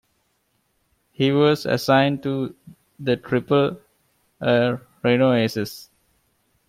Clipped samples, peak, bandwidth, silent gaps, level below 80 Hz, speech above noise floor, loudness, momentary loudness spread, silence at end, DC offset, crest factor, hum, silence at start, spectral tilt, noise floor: under 0.1%; -6 dBFS; 16 kHz; none; -62 dBFS; 49 dB; -21 LUFS; 12 LU; 0.85 s; under 0.1%; 18 dB; none; 1.2 s; -6.5 dB/octave; -69 dBFS